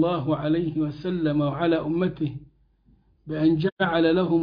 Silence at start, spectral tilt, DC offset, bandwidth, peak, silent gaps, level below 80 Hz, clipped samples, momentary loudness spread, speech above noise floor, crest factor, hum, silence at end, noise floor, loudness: 0 s; -10 dB/octave; under 0.1%; 5.2 kHz; -10 dBFS; 3.72-3.77 s; -54 dBFS; under 0.1%; 9 LU; 37 dB; 14 dB; none; 0 s; -60 dBFS; -24 LUFS